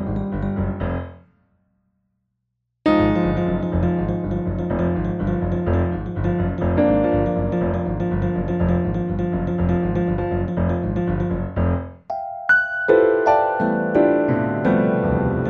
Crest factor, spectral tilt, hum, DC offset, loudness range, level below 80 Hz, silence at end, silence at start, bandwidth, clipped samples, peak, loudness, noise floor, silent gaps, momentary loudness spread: 18 dB; -9.5 dB/octave; none; under 0.1%; 5 LU; -34 dBFS; 0 s; 0 s; 6 kHz; under 0.1%; -2 dBFS; -21 LUFS; -75 dBFS; none; 7 LU